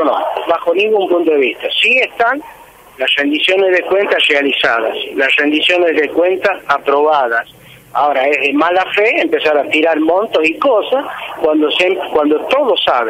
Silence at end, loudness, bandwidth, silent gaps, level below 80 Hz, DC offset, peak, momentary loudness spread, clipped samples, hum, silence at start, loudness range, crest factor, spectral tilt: 0 s; -13 LUFS; 16 kHz; none; -56 dBFS; under 0.1%; -2 dBFS; 5 LU; under 0.1%; none; 0 s; 1 LU; 12 dB; -3.5 dB/octave